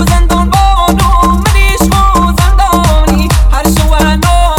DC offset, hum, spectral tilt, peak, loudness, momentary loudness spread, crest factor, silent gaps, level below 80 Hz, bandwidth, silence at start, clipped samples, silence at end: under 0.1%; none; -5 dB/octave; 0 dBFS; -9 LUFS; 1 LU; 6 dB; none; -10 dBFS; 17.5 kHz; 0 s; 2%; 0 s